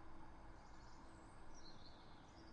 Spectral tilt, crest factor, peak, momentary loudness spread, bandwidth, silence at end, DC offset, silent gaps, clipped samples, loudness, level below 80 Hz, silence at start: -4.5 dB/octave; 12 dB; -44 dBFS; 2 LU; 9 kHz; 0 s; under 0.1%; none; under 0.1%; -62 LUFS; -62 dBFS; 0 s